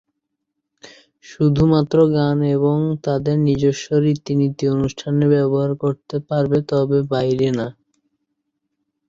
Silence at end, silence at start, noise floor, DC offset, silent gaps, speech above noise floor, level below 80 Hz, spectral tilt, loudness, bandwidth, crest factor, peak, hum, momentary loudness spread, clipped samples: 1.4 s; 0.85 s; -77 dBFS; under 0.1%; none; 60 dB; -48 dBFS; -8 dB/octave; -18 LUFS; 7.6 kHz; 16 dB; -4 dBFS; none; 6 LU; under 0.1%